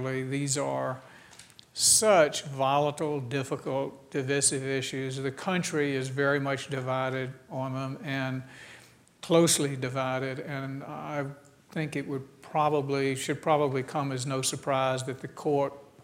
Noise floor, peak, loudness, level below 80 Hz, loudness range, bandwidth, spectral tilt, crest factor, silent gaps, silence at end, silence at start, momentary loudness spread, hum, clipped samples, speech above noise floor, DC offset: -55 dBFS; -8 dBFS; -28 LUFS; -70 dBFS; 6 LU; 16 kHz; -3.5 dB/octave; 22 dB; none; 0 s; 0 s; 13 LU; none; under 0.1%; 26 dB; under 0.1%